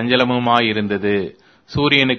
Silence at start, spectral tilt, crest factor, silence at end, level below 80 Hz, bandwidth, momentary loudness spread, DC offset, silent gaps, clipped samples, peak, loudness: 0 s; -6.5 dB/octave; 18 dB; 0 s; -50 dBFS; 6.6 kHz; 9 LU; under 0.1%; none; under 0.1%; 0 dBFS; -17 LUFS